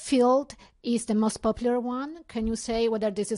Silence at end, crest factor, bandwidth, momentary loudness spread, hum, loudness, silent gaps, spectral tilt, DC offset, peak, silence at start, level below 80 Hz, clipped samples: 0 s; 14 dB; 11 kHz; 12 LU; none; -27 LUFS; none; -5 dB/octave; under 0.1%; -12 dBFS; 0 s; -48 dBFS; under 0.1%